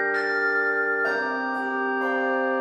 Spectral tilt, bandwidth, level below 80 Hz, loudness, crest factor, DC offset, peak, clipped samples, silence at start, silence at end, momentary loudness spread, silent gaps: -4.5 dB/octave; 9.4 kHz; -84 dBFS; -24 LUFS; 12 dB; under 0.1%; -12 dBFS; under 0.1%; 0 s; 0 s; 4 LU; none